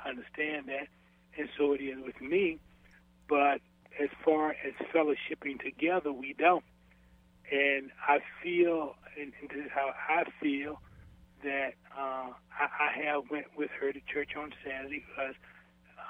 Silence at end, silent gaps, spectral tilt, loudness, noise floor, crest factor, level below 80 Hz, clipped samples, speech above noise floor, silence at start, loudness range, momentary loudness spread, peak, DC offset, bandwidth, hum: 0 s; none; -6.5 dB/octave; -33 LUFS; -62 dBFS; 22 dB; -66 dBFS; under 0.1%; 29 dB; 0 s; 4 LU; 14 LU; -12 dBFS; under 0.1%; 4 kHz; none